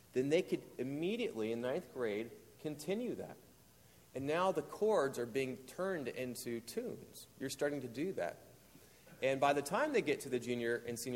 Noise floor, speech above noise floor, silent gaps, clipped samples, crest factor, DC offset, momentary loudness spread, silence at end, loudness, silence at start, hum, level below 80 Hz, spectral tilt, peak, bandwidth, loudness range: -64 dBFS; 26 dB; none; under 0.1%; 20 dB; under 0.1%; 13 LU; 0 s; -38 LUFS; 0.15 s; none; -74 dBFS; -5 dB/octave; -20 dBFS; 16.5 kHz; 4 LU